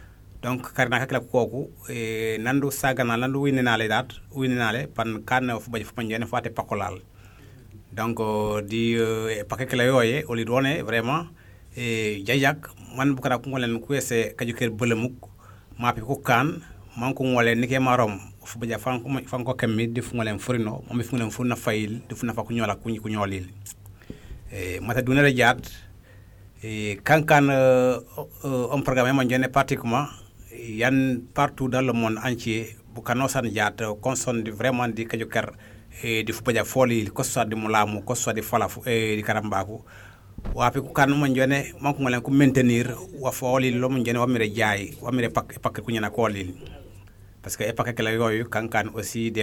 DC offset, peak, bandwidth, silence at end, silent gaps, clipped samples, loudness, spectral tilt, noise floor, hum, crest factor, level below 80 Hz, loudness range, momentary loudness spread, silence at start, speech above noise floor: under 0.1%; -4 dBFS; 18 kHz; 0 s; none; under 0.1%; -24 LUFS; -5 dB/octave; -48 dBFS; none; 20 dB; -50 dBFS; 5 LU; 13 LU; 0 s; 24 dB